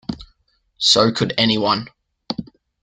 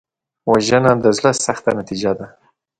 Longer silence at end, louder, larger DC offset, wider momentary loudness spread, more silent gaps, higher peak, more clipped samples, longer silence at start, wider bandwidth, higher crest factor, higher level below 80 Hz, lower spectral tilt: about the same, 0.4 s vs 0.5 s; about the same, -17 LUFS vs -17 LUFS; neither; first, 19 LU vs 13 LU; neither; about the same, 0 dBFS vs 0 dBFS; neither; second, 0.1 s vs 0.45 s; second, 9.4 kHz vs 11 kHz; about the same, 20 dB vs 18 dB; about the same, -52 dBFS vs -50 dBFS; about the same, -4 dB/octave vs -4.5 dB/octave